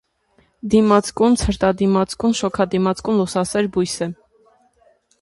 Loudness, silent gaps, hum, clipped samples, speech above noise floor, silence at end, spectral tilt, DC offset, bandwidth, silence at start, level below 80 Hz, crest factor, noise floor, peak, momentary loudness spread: -18 LUFS; none; none; under 0.1%; 42 dB; 1.1 s; -5.5 dB/octave; under 0.1%; 11.5 kHz; 0.65 s; -40 dBFS; 18 dB; -60 dBFS; -2 dBFS; 6 LU